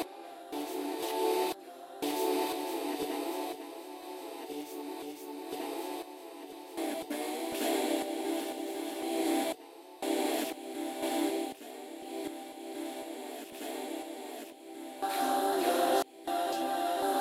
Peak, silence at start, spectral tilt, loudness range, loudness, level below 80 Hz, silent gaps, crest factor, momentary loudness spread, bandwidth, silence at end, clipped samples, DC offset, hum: -16 dBFS; 0 s; -2 dB/octave; 7 LU; -35 LUFS; -78 dBFS; none; 18 dB; 13 LU; 16 kHz; 0 s; under 0.1%; under 0.1%; none